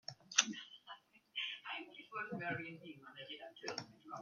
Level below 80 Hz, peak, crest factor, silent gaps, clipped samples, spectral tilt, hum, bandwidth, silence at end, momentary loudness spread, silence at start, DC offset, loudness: -88 dBFS; -8 dBFS; 38 dB; none; under 0.1%; -1 dB/octave; none; 15.5 kHz; 0 s; 20 LU; 0.1 s; under 0.1%; -42 LUFS